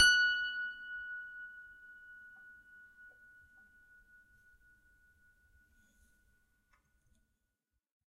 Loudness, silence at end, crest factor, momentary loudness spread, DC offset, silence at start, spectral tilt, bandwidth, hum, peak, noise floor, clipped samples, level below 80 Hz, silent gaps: -34 LUFS; 5.6 s; 26 dB; 28 LU; under 0.1%; 0 s; 2.5 dB/octave; 13.5 kHz; none; -12 dBFS; -86 dBFS; under 0.1%; -72 dBFS; none